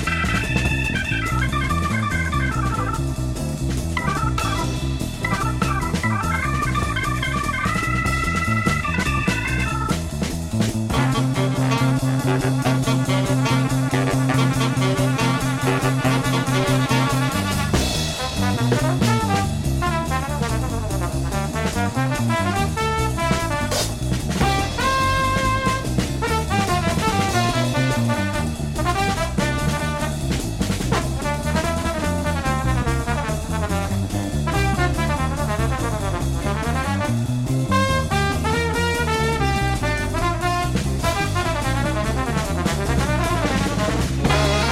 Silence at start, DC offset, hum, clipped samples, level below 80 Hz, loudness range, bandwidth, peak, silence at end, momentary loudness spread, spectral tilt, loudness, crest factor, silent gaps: 0 s; under 0.1%; none; under 0.1%; -30 dBFS; 3 LU; 16 kHz; -4 dBFS; 0 s; 4 LU; -5 dB/octave; -21 LUFS; 16 dB; none